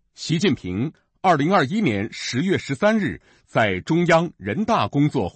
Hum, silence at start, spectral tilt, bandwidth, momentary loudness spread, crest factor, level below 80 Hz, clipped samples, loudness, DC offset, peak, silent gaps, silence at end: none; 0.2 s; -6 dB/octave; 8.8 kHz; 9 LU; 14 dB; -54 dBFS; under 0.1%; -21 LUFS; under 0.1%; -6 dBFS; none; 0.05 s